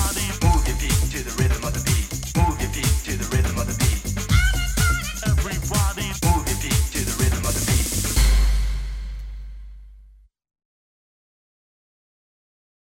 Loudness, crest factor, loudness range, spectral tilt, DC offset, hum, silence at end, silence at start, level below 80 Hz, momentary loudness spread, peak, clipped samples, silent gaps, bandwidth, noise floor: -22 LUFS; 16 dB; 5 LU; -4 dB/octave; under 0.1%; none; 2.95 s; 0 s; -24 dBFS; 7 LU; -6 dBFS; under 0.1%; none; 16.5 kHz; -51 dBFS